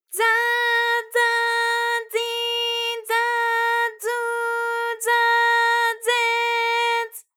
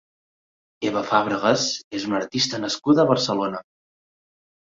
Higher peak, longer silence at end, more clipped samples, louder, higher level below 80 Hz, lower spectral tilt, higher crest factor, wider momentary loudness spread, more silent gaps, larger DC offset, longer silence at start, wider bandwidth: second, -8 dBFS vs -2 dBFS; second, 0.15 s vs 1.05 s; neither; about the same, -20 LUFS vs -22 LUFS; second, under -90 dBFS vs -64 dBFS; second, 5 dB/octave vs -4 dB/octave; second, 14 dB vs 22 dB; second, 6 LU vs 10 LU; second, none vs 1.84-1.91 s; neither; second, 0.1 s vs 0.8 s; first, 20 kHz vs 7.8 kHz